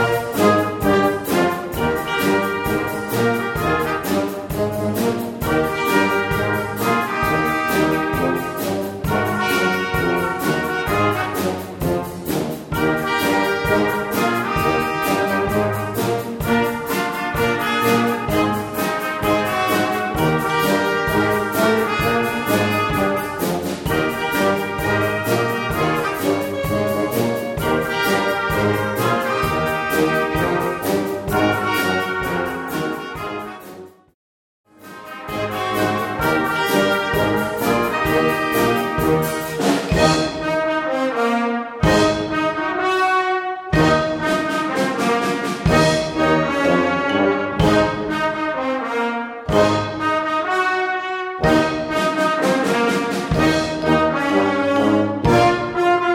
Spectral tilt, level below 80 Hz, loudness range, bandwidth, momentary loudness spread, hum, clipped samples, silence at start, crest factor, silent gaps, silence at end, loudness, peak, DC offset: -5 dB/octave; -40 dBFS; 3 LU; 17.5 kHz; 6 LU; none; under 0.1%; 0 s; 18 dB; 34.14-34.64 s; 0 s; -19 LUFS; -2 dBFS; under 0.1%